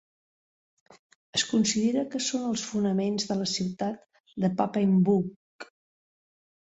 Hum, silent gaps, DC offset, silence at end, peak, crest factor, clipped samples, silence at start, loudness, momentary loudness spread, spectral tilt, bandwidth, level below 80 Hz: none; 4.20-4.24 s, 5.36-5.59 s; under 0.1%; 1.05 s; -10 dBFS; 18 dB; under 0.1%; 1.35 s; -27 LUFS; 20 LU; -5 dB/octave; 8.2 kHz; -68 dBFS